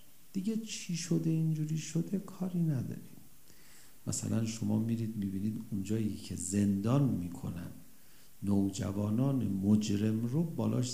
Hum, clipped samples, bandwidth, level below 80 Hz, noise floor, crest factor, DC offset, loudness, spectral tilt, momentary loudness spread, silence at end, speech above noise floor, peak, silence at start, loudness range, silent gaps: none; under 0.1%; 15.5 kHz; -70 dBFS; -61 dBFS; 18 dB; 0.3%; -34 LUFS; -6.5 dB/octave; 10 LU; 0 s; 28 dB; -16 dBFS; 0.35 s; 3 LU; none